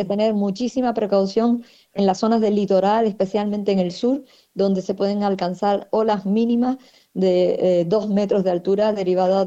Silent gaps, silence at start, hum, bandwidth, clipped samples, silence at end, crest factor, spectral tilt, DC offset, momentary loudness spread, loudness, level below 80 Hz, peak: none; 0 s; none; 8 kHz; under 0.1%; 0 s; 14 dB; -7 dB/octave; under 0.1%; 5 LU; -20 LUFS; -60 dBFS; -6 dBFS